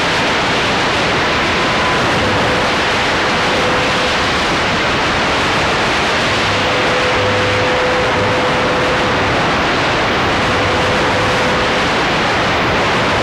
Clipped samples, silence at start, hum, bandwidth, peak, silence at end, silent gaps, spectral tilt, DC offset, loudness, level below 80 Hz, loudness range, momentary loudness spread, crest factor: under 0.1%; 0 s; none; 16 kHz; -4 dBFS; 0 s; none; -4 dB/octave; under 0.1%; -13 LUFS; -34 dBFS; 0 LU; 0 LU; 10 dB